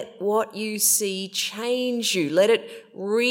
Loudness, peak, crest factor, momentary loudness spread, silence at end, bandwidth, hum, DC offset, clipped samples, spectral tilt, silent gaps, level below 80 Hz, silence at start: -22 LUFS; -6 dBFS; 18 dB; 8 LU; 0 s; 16.5 kHz; none; under 0.1%; under 0.1%; -2 dB/octave; none; -84 dBFS; 0 s